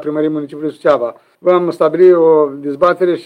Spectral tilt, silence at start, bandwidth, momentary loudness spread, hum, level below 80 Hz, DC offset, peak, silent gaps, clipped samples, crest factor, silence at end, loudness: -8 dB/octave; 0 s; 8.6 kHz; 11 LU; none; -60 dBFS; under 0.1%; 0 dBFS; none; under 0.1%; 12 dB; 0 s; -13 LUFS